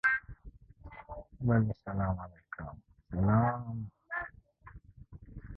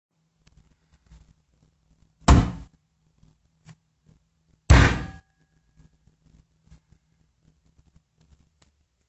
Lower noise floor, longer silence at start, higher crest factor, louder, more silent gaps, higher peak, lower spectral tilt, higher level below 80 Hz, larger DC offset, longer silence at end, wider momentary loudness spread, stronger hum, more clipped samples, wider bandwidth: second, -55 dBFS vs -67 dBFS; second, 0.05 s vs 2.3 s; second, 18 dB vs 26 dB; second, -33 LUFS vs -20 LUFS; neither; second, -16 dBFS vs -2 dBFS; first, -10 dB/octave vs -5.5 dB/octave; second, -50 dBFS vs -30 dBFS; neither; second, 0 s vs 4 s; first, 25 LU vs 21 LU; neither; neither; second, 4.7 kHz vs 8.4 kHz